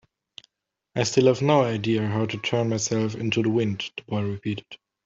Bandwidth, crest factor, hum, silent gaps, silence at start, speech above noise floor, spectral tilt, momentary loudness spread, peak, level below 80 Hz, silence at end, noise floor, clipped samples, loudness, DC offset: 8 kHz; 20 dB; none; none; 0.95 s; 55 dB; -5.5 dB/octave; 11 LU; -6 dBFS; -62 dBFS; 0.3 s; -79 dBFS; under 0.1%; -24 LUFS; under 0.1%